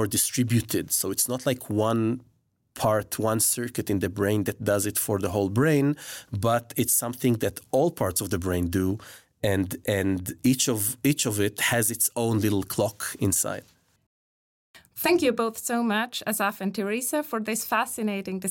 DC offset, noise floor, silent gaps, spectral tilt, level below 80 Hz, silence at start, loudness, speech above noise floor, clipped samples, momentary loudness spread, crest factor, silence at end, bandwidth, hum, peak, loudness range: under 0.1%; under -90 dBFS; 14.06-14.74 s; -4 dB/octave; -60 dBFS; 0 s; -25 LUFS; over 65 dB; under 0.1%; 6 LU; 16 dB; 0 s; 17 kHz; none; -10 dBFS; 3 LU